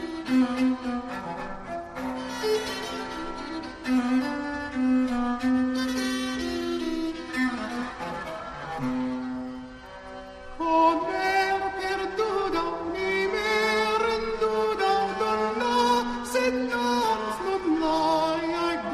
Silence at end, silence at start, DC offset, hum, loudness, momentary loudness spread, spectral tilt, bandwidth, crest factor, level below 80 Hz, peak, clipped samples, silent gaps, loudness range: 0 s; 0 s; under 0.1%; none; -27 LUFS; 11 LU; -4 dB/octave; 13 kHz; 16 dB; -50 dBFS; -10 dBFS; under 0.1%; none; 6 LU